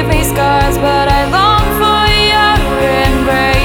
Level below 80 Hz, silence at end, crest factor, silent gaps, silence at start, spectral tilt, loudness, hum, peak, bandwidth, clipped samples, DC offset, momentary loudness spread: -18 dBFS; 0 s; 10 dB; none; 0 s; -4.5 dB/octave; -10 LUFS; none; 0 dBFS; 19 kHz; under 0.1%; 0.1%; 3 LU